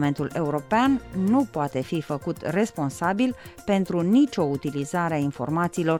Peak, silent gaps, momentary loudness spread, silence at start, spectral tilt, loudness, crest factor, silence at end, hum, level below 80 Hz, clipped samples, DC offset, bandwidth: -10 dBFS; none; 7 LU; 0 s; -6.5 dB/octave; -25 LUFS; 14 dB; 0 s; none; -54 dBFS; under 0.1%; under 0.1%; 17 kHz